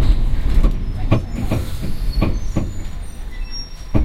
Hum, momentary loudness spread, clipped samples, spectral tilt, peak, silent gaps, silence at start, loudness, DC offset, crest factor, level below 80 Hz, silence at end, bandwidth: none; 12 LU; under 0.1%; -7 dB/octave; -2 dBFS; none; 0 s; -23 LUFS; under 0.1%; 16 dB; -18 dBFS; 0 s; 14 kHz